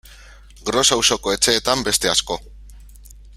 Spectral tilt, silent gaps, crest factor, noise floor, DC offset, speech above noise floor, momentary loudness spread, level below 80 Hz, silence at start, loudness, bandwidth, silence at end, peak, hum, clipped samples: -1.5 dB/octave; none; 20 dB; -43 dBFS; under 0.1%; 25 dB; 14 LU; -42 dBFS; 0.1 s; -17 LUFS; 16 kHz; 0 s; 0 dBFS; none; under 0.1%